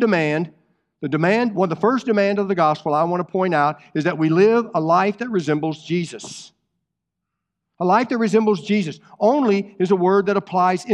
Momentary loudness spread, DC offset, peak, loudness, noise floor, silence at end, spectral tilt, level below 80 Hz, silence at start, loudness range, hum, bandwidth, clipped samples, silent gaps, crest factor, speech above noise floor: 8 LU; under 0.1%; -4 dBFS; -19 LUFS; -80 dBFS; 0 s; -6.5 dB/octave; -70 dBFS; 0 s; 4 LU; none; 10.5 kHz; under 0.1%; none; 16 dB; 62 dB